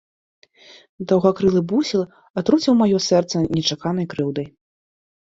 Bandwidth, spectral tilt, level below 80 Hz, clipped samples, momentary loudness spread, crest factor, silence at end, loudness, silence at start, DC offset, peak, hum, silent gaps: 7.8 kHz; -6 dB/octave; -54 dBFS; under 0.1%; 10 LU; 18 dB; 0.75 s; -19 LUFS; 1 s; under 0.1%; -2 dBFS; none; 2.30-2.34 s